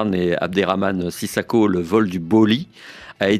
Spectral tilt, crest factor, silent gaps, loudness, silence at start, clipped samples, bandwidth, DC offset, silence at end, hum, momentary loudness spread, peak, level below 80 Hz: -6 dB/octave; 16 dB; none; -19 LUFS; 0 s; under 0.1%; 15 kHz; under 0.1%; 0 s; none; 9 LU; -2 dBFS; -56 dBFS